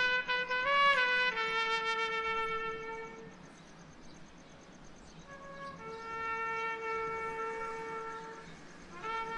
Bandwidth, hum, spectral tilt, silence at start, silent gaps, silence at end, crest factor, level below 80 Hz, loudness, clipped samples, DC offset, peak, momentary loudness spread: 11.5 kHz; none; -2.5 dB/octave; 0 s; none; 0 s; 20 dB; -62 dBFS; -33 LUFS; under 0.1%; under 0.1%; -16 dBFS; 26 LU